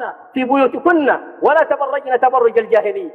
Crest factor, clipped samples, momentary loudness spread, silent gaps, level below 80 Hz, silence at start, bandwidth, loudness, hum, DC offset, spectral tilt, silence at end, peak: 14 dB; under 0.1%; 5 LU; none; -66 dBFS; 0 s; 4.8 kHz; -15 LUFS; none; under 0.1%; -6.5 dB/octave; 0 s; -2 dBFS